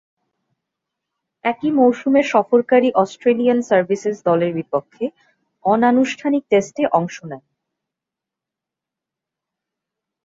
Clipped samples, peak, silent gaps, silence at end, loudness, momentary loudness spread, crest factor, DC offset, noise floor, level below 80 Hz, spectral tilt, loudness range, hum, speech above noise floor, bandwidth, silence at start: under 0.1%; -2 dBFS; none; 2.9 s; -18 LUFS; 13 LU; 18 dB; under 0.1%; -86 dBFS; -66 dBFS; -6 dB/octave; 7 LU; none; 69 dB; 7.8 kHz; 1.45 s